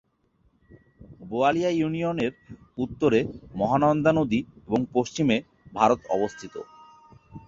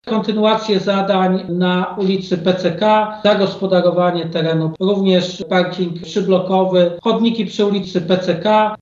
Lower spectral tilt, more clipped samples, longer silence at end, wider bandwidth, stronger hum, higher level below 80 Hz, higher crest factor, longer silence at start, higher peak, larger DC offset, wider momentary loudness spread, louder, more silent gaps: about the same, -6.5 dB/octave vs -6.5 dB/octave; neither; about the same, 0.1 s vs 0.05 s; about the same, 7.6 kHz vs 7.4 kHz; neither; about the same, -56 dBFS vs -56 dBFS; about the same, 20 dB vs 16 dB; first, 1 s vs 0.05 s; second, -6 dBFS vs 0 dBFS; neither; first, 15 LU vs 4 LU; second, -25 LUFS vs -16 LUFS; neither